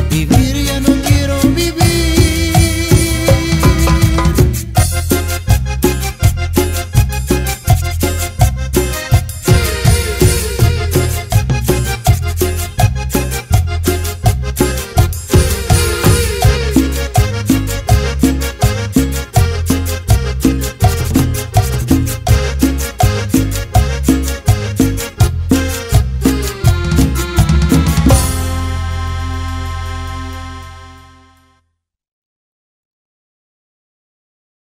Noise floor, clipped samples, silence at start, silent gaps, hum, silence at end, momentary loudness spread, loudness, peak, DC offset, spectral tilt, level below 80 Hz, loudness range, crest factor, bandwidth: -68 dBFS; under 0.1%; 0 s; none; none; 3.8 s; 5 LU; -14 LUFS; 0 dBFS; under 0.1%; -5.5 dB/octave; -18 dBFS; 3 LU; 14 dB; 16.5 kHz